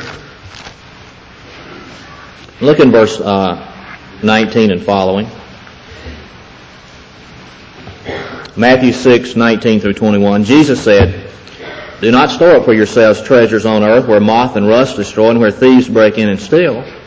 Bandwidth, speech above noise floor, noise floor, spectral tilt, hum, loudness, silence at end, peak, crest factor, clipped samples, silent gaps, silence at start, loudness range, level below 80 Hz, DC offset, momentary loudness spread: 8 kHz; 27 dB; -36 dBFS; -6 dB/octave; none; -10 LUFS; 0.05 s; 0 dBFS; 12 dB; under 0.1%; none; 0 s; 8 LU; -36 dBFS; under 0.1%; 23 LU